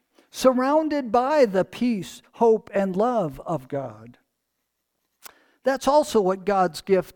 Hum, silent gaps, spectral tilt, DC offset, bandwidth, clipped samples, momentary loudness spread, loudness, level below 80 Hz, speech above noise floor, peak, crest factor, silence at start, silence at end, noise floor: none; none; -5.5 dB/octave; under 0.1%; 19 kHz; under 0.1%; 11 LU; -22 LUFS; -58 dBFS; 56 dB; -6 dBFS; 18 dB; 0.35 s; 0.05 s; -78 dBFS